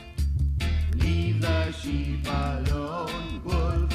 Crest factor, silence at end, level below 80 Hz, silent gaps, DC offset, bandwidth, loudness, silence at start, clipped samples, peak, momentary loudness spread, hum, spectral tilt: 14 dB; 0 s; -28 dBFS; none; under 0.1%; 13.5 kHz; -27 LUFS; 0 s; under 0.1%; -12 dBFS; 6 LU; none; -6.5 dB/octave